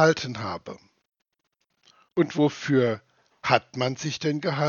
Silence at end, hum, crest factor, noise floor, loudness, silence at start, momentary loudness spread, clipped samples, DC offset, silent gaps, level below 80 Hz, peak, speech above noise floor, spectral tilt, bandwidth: 0 s; none; 24 dB; -77 dBFS; -26 LUFS; 0 s; 13 LU; under 0.1%; under 0.1%; none; -70 dBFS; -2 dBFS; 52 dB; -5.5 dB/octave; 7.2 kHz